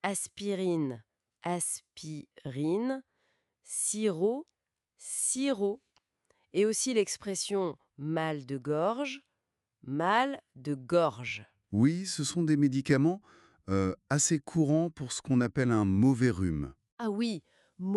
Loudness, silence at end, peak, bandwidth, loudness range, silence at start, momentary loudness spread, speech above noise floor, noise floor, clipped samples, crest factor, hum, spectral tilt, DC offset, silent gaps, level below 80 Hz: -31 LUFS; 0 s; -12 dBFS; 12 kHz; 6 LU; 0.05 s; 14 LU; 55 dB; -85 dBFS; under 0.1%; 18 dB; none; -5 dB/octave; under 0.1%; 16.92-16.97 s; -64 dBFS